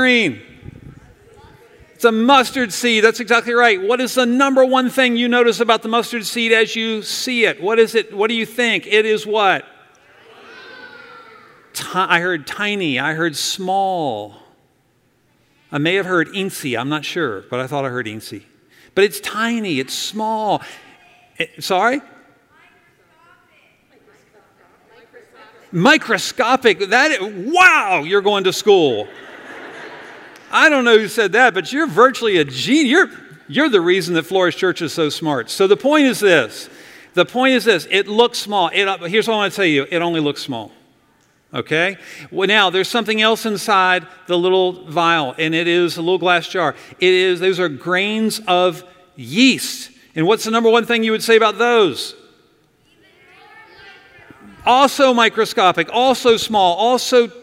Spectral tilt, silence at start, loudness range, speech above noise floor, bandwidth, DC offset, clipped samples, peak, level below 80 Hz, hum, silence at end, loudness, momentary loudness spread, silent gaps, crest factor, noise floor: -3.5 dB/octave; 0 s; 7 LU; 44 dB; 16 kHz; under 0.1%; under 0.1%; 0 dBFS; -62 dBFS; none; 0 s; -16 LUFS; 12 LU; none; 18 dB; -60 dBFS